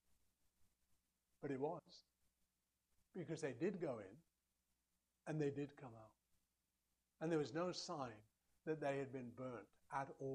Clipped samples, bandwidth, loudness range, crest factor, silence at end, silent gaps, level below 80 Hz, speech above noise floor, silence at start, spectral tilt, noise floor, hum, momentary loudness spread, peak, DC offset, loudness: under 0.1%; 11.5 kHz; 5 LU; 20 dB; 0 s; none; -84 dBFS; 43 dB; 0.6 s; -6 dB/octave; -89 dBFS; none; 15 LU; -30 dBFS; under 0.1%; -48 LUFS